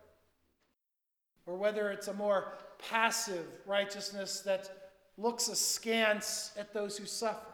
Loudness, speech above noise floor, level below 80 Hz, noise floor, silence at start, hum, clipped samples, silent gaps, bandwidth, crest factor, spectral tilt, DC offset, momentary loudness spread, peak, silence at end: -34 LUFS; 52 dB; -80 dBFS; -87 dBFS; 1.45 s; none; under 0.1%; none; 19.5 kHz; 24 dB; -1.5 dB/octave; under 0.1%; 10 LU; -14 dBFS; 0 s